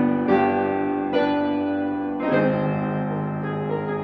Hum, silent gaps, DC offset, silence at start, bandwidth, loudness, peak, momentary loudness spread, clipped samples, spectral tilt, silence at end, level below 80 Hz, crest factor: none; none; under 0.1%; 0 s; 5.4 kHz; -23 LUFS; -8 dBFS; 7 LU; under 0.1%; -9.5 dB/octave; 0 s; -62 dBFS; 16 dB